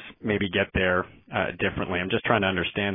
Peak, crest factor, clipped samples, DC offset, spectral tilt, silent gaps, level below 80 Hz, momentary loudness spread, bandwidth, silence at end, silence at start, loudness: -4 dBFS; 22 dB; under 0.1%; under 0.1%; -9.5 dB/octave; none; -48 dBFS; 6 LU; 3.8 kHz; 0 s; 0 s; -25 LUFS